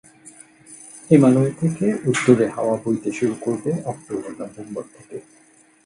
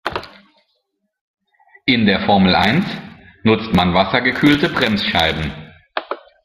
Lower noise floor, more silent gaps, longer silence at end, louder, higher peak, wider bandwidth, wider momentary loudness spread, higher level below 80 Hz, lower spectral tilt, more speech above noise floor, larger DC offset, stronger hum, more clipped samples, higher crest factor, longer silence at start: second, -47 dBFS vs -70 dBFS; second, none vs 1.21-1.34 s; first, 0.65 s vs 0.3 s; second, -20 LUFS vs -16 LUFS; about the same, 0 dBFS vs 0 dBFS; second, 11.5 kHz vs 15 kHz; first, 23 LU vs 15 LU; second, -62 dBFS vs -44 dBFS; about the same, -7 dB/octave vs -6 dB/octave; second, 27 dB vs 55 dB; neither; neither; neither; about the same, 20 dB vs 18 dB; first, 0.25 s vs 0.05 s